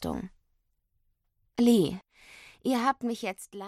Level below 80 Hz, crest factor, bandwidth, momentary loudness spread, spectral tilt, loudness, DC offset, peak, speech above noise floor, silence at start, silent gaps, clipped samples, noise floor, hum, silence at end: -58 dBFS; 18 dB; 14 kHz; 17 LU; -5.5 dB/octave; -28 LUFS; under 0.1%; -12 dBFS; 47 dB; 0 s; none; under 0.1%; -74 dBFS; none; 0 s